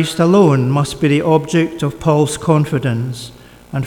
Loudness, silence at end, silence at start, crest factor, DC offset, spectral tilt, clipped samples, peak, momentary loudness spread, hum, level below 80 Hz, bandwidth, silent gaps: -15 LUFS; 0 s; 0 s; 14 dB; under 0.1%; -6.5 dB/octave; under 0.1%; 0 dBFS; 13 LU; none; -44 dBFS; 16.5 kHz; none